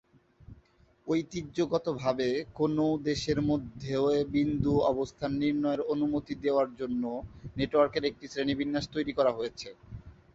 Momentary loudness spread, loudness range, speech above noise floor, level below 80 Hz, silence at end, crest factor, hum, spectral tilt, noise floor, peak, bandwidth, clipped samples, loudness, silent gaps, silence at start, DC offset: 9 LU; 2 LU; 33 dB; -54 dBFS; 0.2 s; 18 dB; none; -6.5 dB/octave; -62 dBFS; -12 dBFS; 8 kHz; under 0.1%; -30 LUFS; none; 0.5 s; under 0.1%